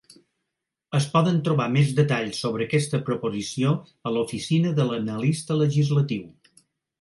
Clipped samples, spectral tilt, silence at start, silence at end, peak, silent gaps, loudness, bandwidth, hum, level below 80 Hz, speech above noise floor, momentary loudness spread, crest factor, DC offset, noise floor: under 0.1%; -6.5 dB/octave; 0.9 s; 0.7 s; -6 dBFS; none; -24 LUFS; 11.5 kHz; none; -64 dBFS; 60 dB; 7 LU; 18 dB; under 0.1%; -83 dBFS